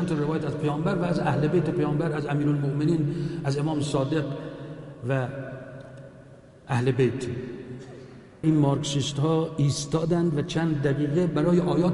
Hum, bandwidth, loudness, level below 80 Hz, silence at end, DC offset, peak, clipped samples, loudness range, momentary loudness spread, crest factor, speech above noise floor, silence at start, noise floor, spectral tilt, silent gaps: none; 11.5 kHz; -26 LUFS; -52 dBFS; 0 s; under 0.1%; -10 dBFS; under 0.1%; 6 LU; 16 LU; 16 dB; 24 dB; 0 s; -49 dBFS; -7 dB/octave; none